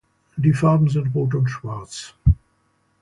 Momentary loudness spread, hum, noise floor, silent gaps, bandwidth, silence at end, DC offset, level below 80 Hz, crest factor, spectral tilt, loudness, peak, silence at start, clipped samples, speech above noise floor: 15 LU; none; -65 dBFS; none; 11 kHz; 0.7 s; under 0.1%; -32 dBFS; 16 dB; -7.5 dB/octave; -20 LUFS; -4 dBFS; 0.35 s; under 0.1%; 45 dB